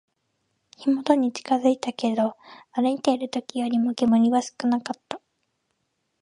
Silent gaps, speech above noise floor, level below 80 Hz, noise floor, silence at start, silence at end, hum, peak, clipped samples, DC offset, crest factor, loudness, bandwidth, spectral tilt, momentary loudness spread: none; 52 dB; -72 dBFS; -75 dBFS; 0.8 s; 1.05 s; none; -4 dBFS; under 0.1%; under 0.1%; 20 dB; -24 LUFS; 11 kHz; -5 dB/octave; 11 LU